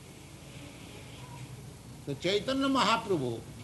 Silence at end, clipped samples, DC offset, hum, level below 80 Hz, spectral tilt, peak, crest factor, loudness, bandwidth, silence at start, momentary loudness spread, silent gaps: 0 s; under 0.1%; under 0.1%; none; -58 dBFS; -4.5 dB/octave; -12 dBFS; 22 dB; -30 LUFS; 12 kHz; 0 s; 21 LU; none